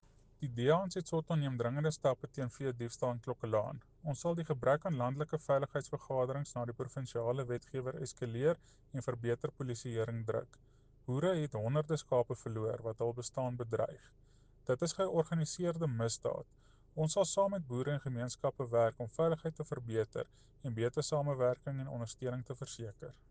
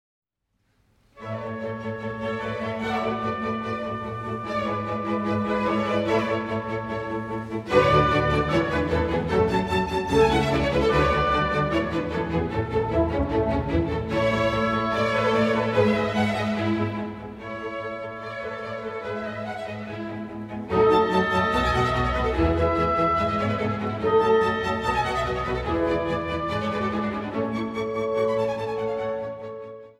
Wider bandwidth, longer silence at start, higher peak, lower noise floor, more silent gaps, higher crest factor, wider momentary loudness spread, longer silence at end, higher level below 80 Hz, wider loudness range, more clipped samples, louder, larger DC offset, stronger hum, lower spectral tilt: second, 9.8 kHz vs 13 kHz; second, 0.4 s vs 1.15 s; second, -18 dBFS vs -6 dBFS; second, -63 dBFS vs -72 dBFS; neither; about the same, 20 dB vs 18 dB; about the same, 10 LU vs 11 LU; about the same, 0.2 s vs 0.1 s; second, -64 dBFS vs -40 dBFS; second, 3 LU vs 7 LU; neither; second, -37 LUFS vs -24 LUFS; neither; neither; about the same, -6 dB/octave vs -6.5 dB/octave